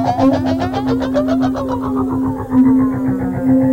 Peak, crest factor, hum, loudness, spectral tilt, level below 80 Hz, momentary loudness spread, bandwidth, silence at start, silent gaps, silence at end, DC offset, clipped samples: -4 dBFS; 12 dB; none; -16 LUFS; -8 dB/octave; -38 dBFS; 6 LU; 7.2 kHz; 0 s; none; 0 s; under 0.1%; under 0.1%